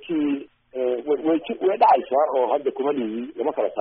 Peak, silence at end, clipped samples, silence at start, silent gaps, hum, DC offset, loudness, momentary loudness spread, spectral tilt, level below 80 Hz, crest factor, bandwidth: -6 dBFS; 0 s; under 0.1%; 0 s; none; none; under 0.1%; -22 LUFS; 10 LU; -1 dB/octave; -68 dBFS; 16 dB; 3.9 kHz